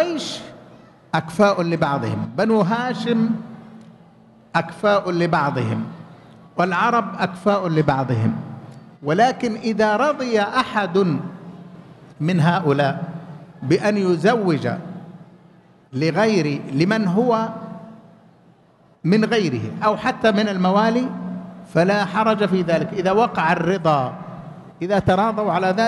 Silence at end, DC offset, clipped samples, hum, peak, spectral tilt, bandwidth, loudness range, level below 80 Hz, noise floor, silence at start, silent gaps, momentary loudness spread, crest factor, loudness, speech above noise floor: 0 s; under 0.1%; under 0.1%; none; -4 dBFS; -6.5 dB/octave; 12 kHz; 3 LU; -56 dBFS; -54 dBFS; 0 s; none; 16 LU; 16 dB; -20 LUFS; 35 dB